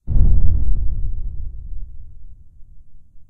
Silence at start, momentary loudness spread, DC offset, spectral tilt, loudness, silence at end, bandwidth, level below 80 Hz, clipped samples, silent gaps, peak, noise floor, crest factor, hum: 0.05 s; 22 LU; under 0.1%; -13 dB/octave; -23 LUFS; 0.1 s; 0.9 kHz; -20 dBFS; under 0.1%; none; 0 dBFS; -37 dBFS; 14 dB; none